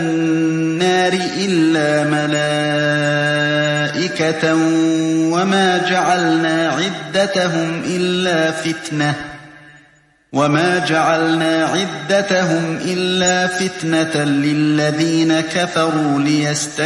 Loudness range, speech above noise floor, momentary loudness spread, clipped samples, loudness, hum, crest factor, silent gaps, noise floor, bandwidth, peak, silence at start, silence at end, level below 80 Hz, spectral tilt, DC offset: 3 LU; 37 dB; 5 LU; under 0.1%; -16 LUFS; none; 14 dB; none; -52 dBFS; 11.5 kHz; -2 dBFS; 0 s; 0 s; -58 dBFS; -4.5 dB/octave; under 0.1%